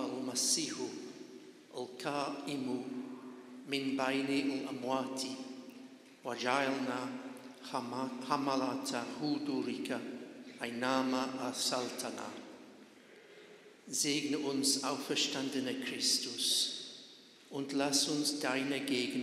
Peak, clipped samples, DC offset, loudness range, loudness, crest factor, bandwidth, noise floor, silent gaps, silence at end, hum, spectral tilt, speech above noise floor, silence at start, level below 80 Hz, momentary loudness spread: -16 dBFS; under 0.1%; under 0.1%; 5 LU; -35 LUFS; 22 dB; 15 kHz; -58 dBFS; none; 0 s; none; -2.5 dB/octave; 23 dB; 0 s; -84 dBFS; 19 LU